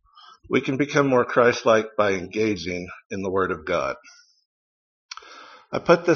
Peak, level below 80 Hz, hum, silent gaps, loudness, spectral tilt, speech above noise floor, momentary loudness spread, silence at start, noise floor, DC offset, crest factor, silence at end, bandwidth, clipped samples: 0 dBFS; -58 dBFS; none; 3.06-3.10 s, 4.46-5.09 s; -22 LUFS; -4.5 dB/octave; 28 dB; 19 LU; 0.5 s; -50 dBFS; under 0.1%; 22 dB; 0 s; 7 kHz; under 0.1%